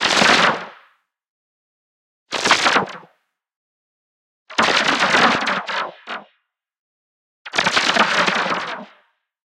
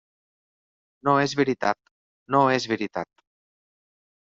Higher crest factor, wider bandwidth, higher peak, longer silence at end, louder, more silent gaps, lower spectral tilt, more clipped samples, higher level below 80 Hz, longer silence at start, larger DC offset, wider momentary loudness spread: about the same, 20 dB vs 22 dB; first, 16 kHz vs 7.6 kHz; first, 0 dBFS vs -6 dBFS; second, 0.6 s vs 1.15 s; first, -17 LUFS vs -24 LUFS; first, 1.30-2.26 s, 3.56-4.46 s, 6.79-7.45 s vs 1.91-2.26 s; second, -2 dB/octave vs -4 dB/octave; neither; first, -60 dBFS vs -66 dBFS; second, 0 s vs 1.05 s; neither; first, 17 LU vs 12 LU